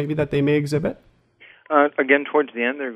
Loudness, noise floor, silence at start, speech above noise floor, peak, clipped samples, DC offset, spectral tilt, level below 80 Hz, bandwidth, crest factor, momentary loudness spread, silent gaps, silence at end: -20 LUFS; -51 dBFS; 0 s; 31 dB; -2 dBFS; under 0.1%; under 0.1%; -7 dB/octave; -52 dBFS; 12.5 kHz; 18 dB; 6 LU; none; 0 s